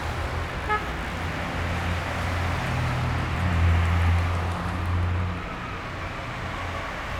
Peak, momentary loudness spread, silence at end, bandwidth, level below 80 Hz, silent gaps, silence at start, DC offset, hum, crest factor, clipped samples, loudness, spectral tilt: -12 dBFS; 10 LU; 0 s; 13 kHz; -36 dBFS; none; 0 s; under 0.1%; none; 14 dB; under 0.1%; -27 LUFS; -6 dB/octave